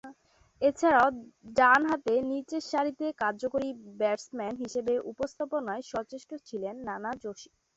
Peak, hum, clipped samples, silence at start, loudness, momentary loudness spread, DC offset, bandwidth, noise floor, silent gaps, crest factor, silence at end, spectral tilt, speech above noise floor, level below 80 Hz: -10 dBFS; none; under 0.1%; 0.05 s; -29 LUFS; 14 LU; under 0.1%; 8.2 kHz; -59 dBFS; none; 20 dB; 0.3 s; -4.5 dB/octave; 30 dB; -66 dBFS